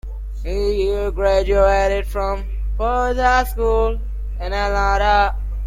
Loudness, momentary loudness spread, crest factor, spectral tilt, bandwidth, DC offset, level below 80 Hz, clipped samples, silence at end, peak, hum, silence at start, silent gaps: -19 LUFS; 11 LU; 14 dB; -5.5 dB/octave; 15.5 kHz; under 0.1%; -22 dBFS; under 0.1%; 0 s; -4 dBFS; 50 Hz at -25 dBFS; 0.05 s; none